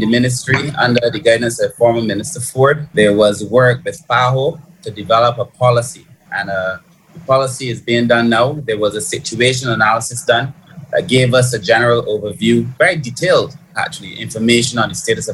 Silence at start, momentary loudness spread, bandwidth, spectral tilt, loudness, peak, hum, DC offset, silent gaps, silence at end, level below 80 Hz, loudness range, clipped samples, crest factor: 0 s; 10 LU; 13 kHz; -4.5 dB/octave; -14 LUFS; 0 dBFS; none; under 0.1%; none; 0 s; -50 dBFS; 3 LU; under 0.1%; 14 dB